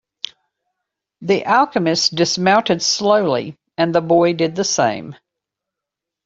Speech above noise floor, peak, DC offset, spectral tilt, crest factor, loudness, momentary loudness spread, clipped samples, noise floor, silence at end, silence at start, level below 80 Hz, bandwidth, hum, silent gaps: 68 dB; -2 dBFS; under 0.1%; -3.5 dB/octave; 18 dB; -16 LUFS; 16 LU; under 0.1%; -84 dBFS; 1.1 s; 1.2 s; -60 dBFS; 7.8 kHz; none; none